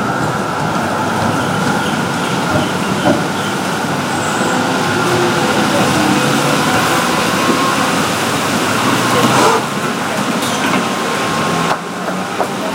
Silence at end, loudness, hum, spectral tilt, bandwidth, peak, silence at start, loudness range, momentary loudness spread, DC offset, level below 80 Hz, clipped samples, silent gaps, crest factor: 0 s; -14 LUFS; none; -4 dB/octave; 16 kHz; 0 dBFS; 0 s; 3 LU; 5 LU; under 0.1%; -48 dBFS; under 0.1%; none; 14 dB